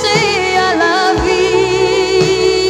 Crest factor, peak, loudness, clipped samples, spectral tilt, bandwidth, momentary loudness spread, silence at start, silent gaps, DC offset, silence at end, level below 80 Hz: 12 dB; 0 dBFS; -12 LUFS; under 0.1%; -4 dB/octave; 12.5 kHz; 1 LU; 0 s; none; under 0.1%; 0 s; -34 dBFS